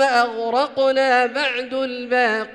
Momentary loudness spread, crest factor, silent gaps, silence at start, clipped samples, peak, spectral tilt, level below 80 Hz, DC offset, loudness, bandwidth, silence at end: 7 LU; 12 dB; none; 0 s; under 0.1%; -6 dBFS; -2.5 dB/octave; -66 dBFS; under 0.1%; -19 LUFS; 10.5 kHz; 0 s